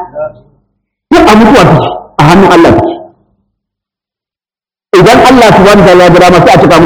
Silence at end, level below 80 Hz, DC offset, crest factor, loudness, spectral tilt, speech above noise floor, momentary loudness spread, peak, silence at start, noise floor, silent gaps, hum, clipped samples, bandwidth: 0 s; -28 dBFS; under 0.1%; 4 dB; -3 LUFS; -6 dB/octave; over 89 dB; 12 LU; 0 dBFS; 0 s; under -90 dBFS; none; none; 30%; over 20 kHz